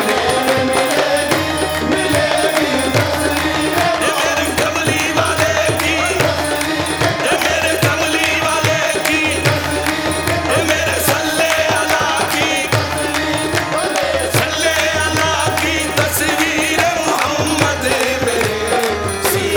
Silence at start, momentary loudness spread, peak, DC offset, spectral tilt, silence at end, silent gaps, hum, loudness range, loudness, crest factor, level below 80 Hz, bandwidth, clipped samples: 0 s; 3 LU; -2 dBFS; under 0.1%; -3.5 dB/octave; 0 s; none; none; 1 LU; -15 LUFS; 14 dB; -38 dBFS; 19.5 kHz; under 0.1%